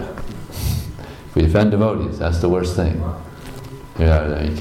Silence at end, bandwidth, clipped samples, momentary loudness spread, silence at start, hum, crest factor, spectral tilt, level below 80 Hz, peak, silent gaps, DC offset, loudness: 0 s; 15.5 kHz; under 0.1%; 19 LU; 0 s; none; 14 dB; -7.5 dB/octave; -30 dBFS; -6 dBFS; none; under 0.1%; -19 LUFS